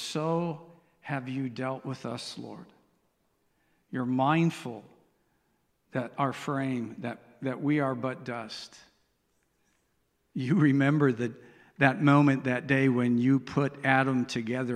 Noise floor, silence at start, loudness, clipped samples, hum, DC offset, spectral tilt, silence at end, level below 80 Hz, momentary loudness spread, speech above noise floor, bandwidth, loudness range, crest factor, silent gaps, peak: -74 dBFS; 0 s; -28 LUFS; under 0.1%; none; under 0.1%; -7 dB/octave; 0 s; -70 dBFS; 16 LU; 46 dB; 11.5 kHz; 10 LU; 24 dB; none; -6 dBFS